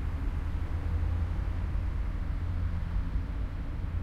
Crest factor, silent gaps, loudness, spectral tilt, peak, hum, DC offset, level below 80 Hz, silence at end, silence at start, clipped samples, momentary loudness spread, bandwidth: 10 dB; none; -35 LUFS; -8.5 dB/octave; -20 dBFS; none; under 0.1%; -34 dBFS; 0 s; 0 s; under 0.1%; 4 LU; 5.8 kHz